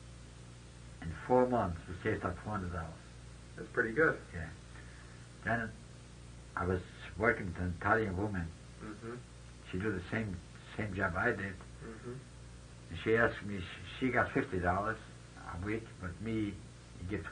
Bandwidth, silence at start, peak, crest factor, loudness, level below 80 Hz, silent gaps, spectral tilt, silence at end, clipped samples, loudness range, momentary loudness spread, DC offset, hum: 10 kHz; 0 s; -12 dBFS; 24 dB; -36 LUFS; -56 dBFS; none; -6.5 dB/octave; 0 s; under 0.1%; 3 LU; 21 LU; under 0.1%; none